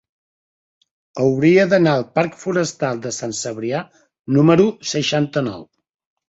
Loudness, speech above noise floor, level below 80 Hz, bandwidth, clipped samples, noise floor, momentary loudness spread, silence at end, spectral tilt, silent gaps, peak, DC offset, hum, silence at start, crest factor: -18 LUFS; over 73 dB; -58 dBFS; 8.2 kHz; under 0.1%; under -90 dBFS; 12 LU; 0.65 s; -5.5 dB/octave; 4.19-4.24 s; -2 dBFS; under 0.1%; none; 1.15 s; 18 dB